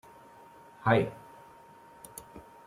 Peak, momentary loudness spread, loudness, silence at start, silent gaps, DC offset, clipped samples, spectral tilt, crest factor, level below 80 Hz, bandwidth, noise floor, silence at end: -8 dBFS; 27 LU; -29 LUFS; 0.85 s; none; under 0.1%; under 0.1%; -6.5 dB/octave; 26 dB; -66 dBFS; 16 kHz; -54 dBFS; 0.25 s